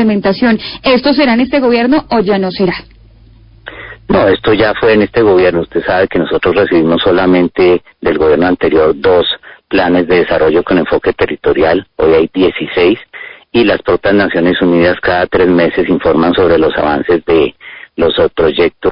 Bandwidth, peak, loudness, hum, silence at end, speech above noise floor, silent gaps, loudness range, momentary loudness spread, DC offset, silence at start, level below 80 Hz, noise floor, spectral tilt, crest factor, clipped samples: 5.4 kHz; 0 dBFS; -11 LUFS; none; 0 s; 30 dB; none; 2 LU; 6 LU; under 0.1%; 0 s; -36 dBFS; -40 dBFS; -10 dB/octave; 10 dB; under 0.1%